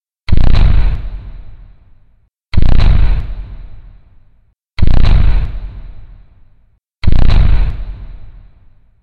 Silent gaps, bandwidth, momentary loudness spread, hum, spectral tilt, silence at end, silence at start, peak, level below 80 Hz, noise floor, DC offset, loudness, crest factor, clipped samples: none; 4.7 kHz; 22 LU; none; -8 dB/octave; 0.7 s; 0.3 s; 0 dBFS; -14 dBFS; -51 dBFS; under 0.1%; -15 LUFS; 10 dB; under 0.1%